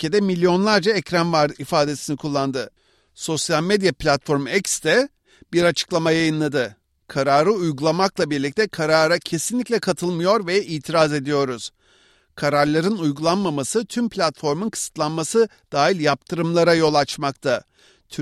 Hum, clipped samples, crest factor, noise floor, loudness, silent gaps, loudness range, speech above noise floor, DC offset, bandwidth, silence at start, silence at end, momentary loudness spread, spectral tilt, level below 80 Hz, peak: none; under 0.1%; 16 dB; -57 dBFS; -20 LUFS; none; 2 LU; 37 dB; under 0.1%; 15 kHz; 0 s; 0 s; 7 LU; -4.5 dB/octave; -54 dBFS; -4 dBFS